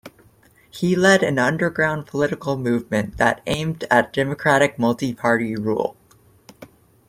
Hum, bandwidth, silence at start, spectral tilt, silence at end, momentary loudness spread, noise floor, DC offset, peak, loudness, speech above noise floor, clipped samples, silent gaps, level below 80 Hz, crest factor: none; 16 kHz; 0.05 s; -5.5 dB/octave; 0.45 s; 8 LU; -54 dBFS; under 0.1%; -2 dBFS; -20 LUFS; 34 dB; under 0.1%; none; -52 dBFS; 20 dB